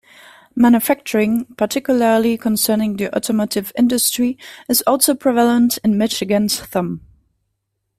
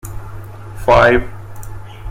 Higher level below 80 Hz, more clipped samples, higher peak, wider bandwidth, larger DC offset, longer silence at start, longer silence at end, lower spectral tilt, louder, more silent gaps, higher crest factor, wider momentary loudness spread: second, -54 dBFS vs -30 dBFS; neither; about the same, 0 dBFS vs 0 dBFS; about the same, 16 kHz vs 16.5 kHz; neither; first, 0.55 s vs 0.05 s; first, 1 s vs 0 s; second, -4 dB/octave vs -6 dB/octave; second, -17 LUFS vs -13 LUFS; neither; about the same, 18 dB vs 16 dB; second, 7 LU vs 23 LU